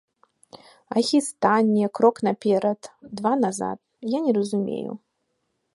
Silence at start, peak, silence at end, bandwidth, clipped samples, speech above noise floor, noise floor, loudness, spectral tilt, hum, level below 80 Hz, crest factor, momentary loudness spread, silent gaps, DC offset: 0.55 s; -6 dBFS; 0.75 s; 11.5 kHz; under 0.1%; 52 dB; -75 dBFS; -23 LUFS; -5.5 dB/octave; none; -70 dBFS; 18 dB; 13 LU; none; under 0.1%